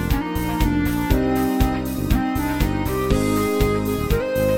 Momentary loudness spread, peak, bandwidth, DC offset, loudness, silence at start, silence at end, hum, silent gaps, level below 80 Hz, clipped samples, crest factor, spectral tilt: 3 LU; -4 dBFS; 17 kHz; under 0.1%; -21 LUFS; 0 s; 0 s; none; none; -26 dBFS; under 0.1%; 16 dB; -6.5 dB/octave